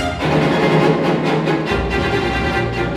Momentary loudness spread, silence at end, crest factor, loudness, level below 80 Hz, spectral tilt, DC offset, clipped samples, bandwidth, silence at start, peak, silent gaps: 4 LU; 0 s; 14 dB; -17 LUFS; -32 dBFS; -6.5 dB/octave; under 0.1%; under 0.1%; 13.5 kHz; 0 s; -2 dBFS; none